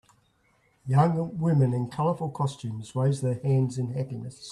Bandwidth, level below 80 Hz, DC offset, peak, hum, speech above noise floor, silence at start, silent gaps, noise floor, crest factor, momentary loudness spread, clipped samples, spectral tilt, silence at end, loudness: 11 kHz; -62 dBFS; under 0.1%; -10 dBFS; none; 40 dB; 0.85 s; none; -66 dBFS; 18 dB; 11 LU; under 0.1%; -8 dB/octave; 0 s; -27 LUFS